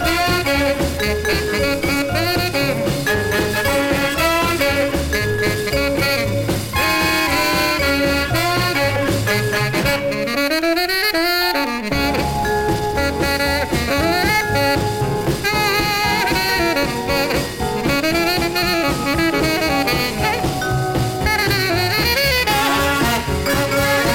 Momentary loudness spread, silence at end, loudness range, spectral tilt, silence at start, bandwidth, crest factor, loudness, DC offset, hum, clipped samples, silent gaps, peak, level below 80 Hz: 4 LU; 0 s; 1 LU; -4 dB/octave; 0 s; 17 kHz; 14 dB; -17 LUFS; under 0.1%; none; under 0.1%; none; -4 dBFS; -32 dBFS